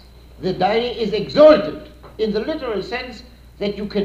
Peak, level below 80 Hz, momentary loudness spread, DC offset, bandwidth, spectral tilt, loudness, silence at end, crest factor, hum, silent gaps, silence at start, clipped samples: -2 dBFS; -44 dBFS; 17 LU; under 0.1%; 7.6 kHz; -6.5 dB/octave; -18 LUFS; 0 s; 18 dB; none; none; 0.4 s; under 0.1%